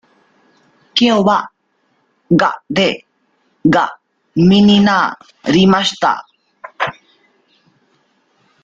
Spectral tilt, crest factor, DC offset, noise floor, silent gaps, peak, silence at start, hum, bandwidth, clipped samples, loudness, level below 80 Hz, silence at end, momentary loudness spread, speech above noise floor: -5.5 dB/octave; 14 dB; under 0.1%; -62 dBFS; none; 0 dBFS; 0.95 s; none; 7.8 kHz; under 0.1%; -14 LUFS; -50 dBFS; 1.7 s; 12 LU; 50 dB